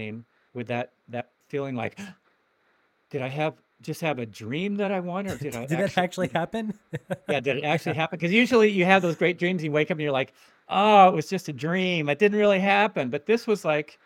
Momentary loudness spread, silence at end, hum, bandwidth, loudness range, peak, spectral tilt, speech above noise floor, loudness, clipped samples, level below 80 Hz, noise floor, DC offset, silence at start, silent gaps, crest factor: 16 LU; 0.2 s; none; 16.5 kHz; 12 LU; -2 dBFS; -6 dB/octave; 43 dB; -24 LUFS; under 0.1%; -68 dBFS; -67 dBFS; under 0.1%; 0 s; none; 22 dB